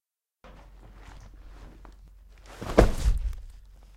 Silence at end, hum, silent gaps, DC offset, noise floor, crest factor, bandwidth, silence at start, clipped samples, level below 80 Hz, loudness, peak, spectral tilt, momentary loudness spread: 0.45 s; none; none; under 0.1%; -56 dBFS; 26 dB; 15 kHz; 0.45 s; under 0.1%; -32 dBFS; -27 LUFS; -4 dBFS; -6.5 dB/octave; 28 LU